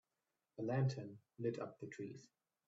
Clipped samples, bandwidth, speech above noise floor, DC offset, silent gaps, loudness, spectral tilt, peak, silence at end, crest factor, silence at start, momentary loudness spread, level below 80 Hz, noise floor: under 0.1%; 7.8 kHz; over 47 dB; under 0.1%; none; -44 LUFS; -7.5 dB/octave; -26 dBFS; 0.4 s; 18 dB; 0.6 s; 17 LU; -82 dBFS; under -90 dBFS